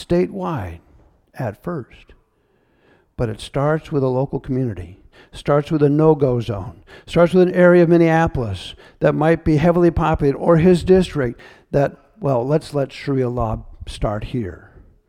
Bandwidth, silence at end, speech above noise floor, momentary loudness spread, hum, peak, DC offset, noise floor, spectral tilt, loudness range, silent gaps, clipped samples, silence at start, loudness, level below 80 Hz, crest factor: 11.5 kHz; 0.55 s; 44 dB; 15 LU; none; 0 dBFS; under 0.1%; -61 dBFS; -8 dB/octave; 9 LU; none; under 0.1%; 0 s; -18 LUFS; -38 dBFS; 18 dB